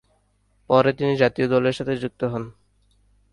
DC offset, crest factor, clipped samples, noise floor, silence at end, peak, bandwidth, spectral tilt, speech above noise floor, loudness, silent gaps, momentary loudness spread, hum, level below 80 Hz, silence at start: under 0.1%; 20 dB; under 0.1%; -64 dBFS; 0.8 s; -4 dBFS; 11 kHz; -7 dB/octave; 44 dB; -22 LUFS; none; 9 LU; 50 Hz at -55 dBFS; -56 dBFS; 0.7 s